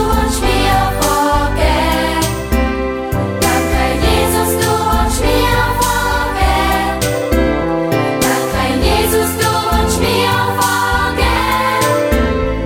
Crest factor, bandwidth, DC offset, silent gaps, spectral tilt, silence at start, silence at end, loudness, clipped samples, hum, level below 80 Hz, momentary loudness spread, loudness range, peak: 12 dB; over 20 kHz; under 0.1%; none; -4.5 dB/octave; 0 s; 0 s; -14 LUFS; under 0.1%; none; -22 dBFS; 3 LU; 1 LU; 0 dBFS